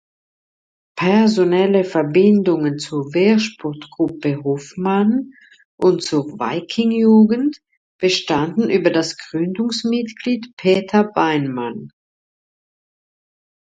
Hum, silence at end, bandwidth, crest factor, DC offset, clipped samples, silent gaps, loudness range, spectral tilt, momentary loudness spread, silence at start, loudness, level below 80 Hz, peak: none; 1.85 s; 9 kHz; 16 dB; under 0.1%; under 0.1%; 5.65-5.78 s, 7.77-7.99 s, 10.53-10.57 s; 4 LU; -6 dB/octave; 10 LU; 0.95 s; -17 LUFS; -60 dBFS; -2 dBFS